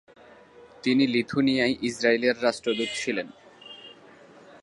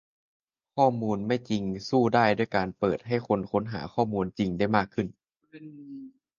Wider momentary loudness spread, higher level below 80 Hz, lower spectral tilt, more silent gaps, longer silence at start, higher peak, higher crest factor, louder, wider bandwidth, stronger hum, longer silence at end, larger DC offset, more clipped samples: about the same, 20 LU vs 19 LU; second, -64 dBFS vs -58 dBFS; second, -4.5 dB/octave vs -7 dB/octave; neither; second, 0.6 s vs 0.75 s; about the same, -8 dBFS vs -6 dBFS; about the same, 20 dB vs 22 dB; about the same, -25 LUFS vs -27 LUFS; first, 11.5 kHz vs 7.4 kHz; neither; second, 0.05 s vs 0.3 s; neither; neither